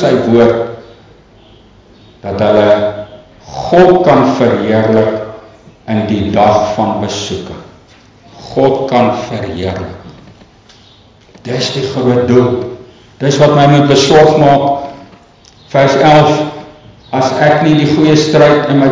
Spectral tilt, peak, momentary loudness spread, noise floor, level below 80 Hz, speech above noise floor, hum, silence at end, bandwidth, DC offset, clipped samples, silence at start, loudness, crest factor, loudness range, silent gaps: -6 dB/octave; 0 dBFS; 18 LU; -42 dBFS; -40 dBFS; 33 dB; none; 0 s; 7.6 kHz; under 0.1%; 0.1%; 0 s; -10 LUFS; 10 dB; 7 LU; none